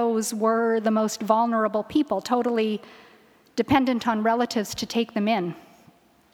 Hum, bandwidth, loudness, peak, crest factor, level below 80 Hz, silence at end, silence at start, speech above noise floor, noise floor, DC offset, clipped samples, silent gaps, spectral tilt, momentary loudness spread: none; 17.5 kHz; -24 LUFS; -4 dBFS; 20 dB; -58 dBFS; 0.75 s; 0 s; 34 dB; -57 dBFS; under 0.1%; under 0.1%; none; -4.5 dB/octave; 6 LU